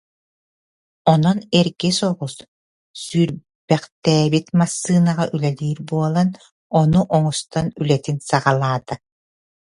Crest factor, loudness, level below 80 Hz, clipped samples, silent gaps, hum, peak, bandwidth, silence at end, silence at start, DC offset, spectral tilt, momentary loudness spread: 18 dB; -19 LUFS; -52 dBFS; under 0.1%; 2.48-2.94 s, 3.55-3.68 s, 3.92-4.02 s, 6.51-6.70 s; none; 0 dBFS; 11.5 kHz; 0.7 s; 1.05 s; under 0.1%; -6 dB/octave; 9 LU